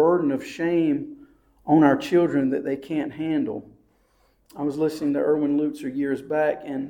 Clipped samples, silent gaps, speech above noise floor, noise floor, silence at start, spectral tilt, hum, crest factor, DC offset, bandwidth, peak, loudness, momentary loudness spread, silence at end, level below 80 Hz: under 0.1%; none; 40 dB; -63 dBFS; 0 s; -7.5 dB/octave; none; 18 dB; under 0.1%; 13 kHz; -6 dBFS; -23 LUFS; 11 LU; 0 s; -62 dBFS